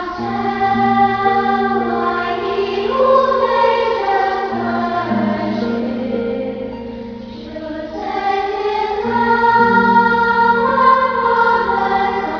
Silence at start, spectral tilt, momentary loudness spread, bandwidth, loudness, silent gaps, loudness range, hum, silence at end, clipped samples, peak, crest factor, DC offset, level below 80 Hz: 0 s; -6.5 dB/octave; 13 LU; 5.4 kHz; -15 LUFS; none; 9 LU; none; 0 s; under 0.1%; 0 dBFS; 14 dB; under 0.1%; -44 dBFS